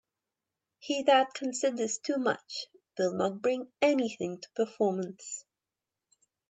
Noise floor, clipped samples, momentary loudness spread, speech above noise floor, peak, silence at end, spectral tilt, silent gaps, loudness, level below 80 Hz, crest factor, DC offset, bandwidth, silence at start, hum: -90 dBFS; under 0.1%; 15 LU; 60 dB; -12 dBFS; 1.1 s; -3.5 dB/octave; none; -30 LUFS; -82 dBFS; 20 dB; under 0.1%; 9.2 kHz; 0.85 s; none